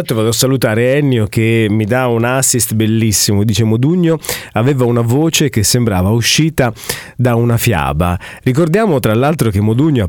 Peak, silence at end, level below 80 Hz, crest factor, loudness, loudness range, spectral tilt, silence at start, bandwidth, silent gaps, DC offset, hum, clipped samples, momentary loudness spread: 0 dBFS; 0 s; -36 dBFS; 12 dB; -13 LUFS; 1 LU; -5 dB/octave; 0 s; 19 kHz; none; under 0.1%; none; under 0.1%; 5 LU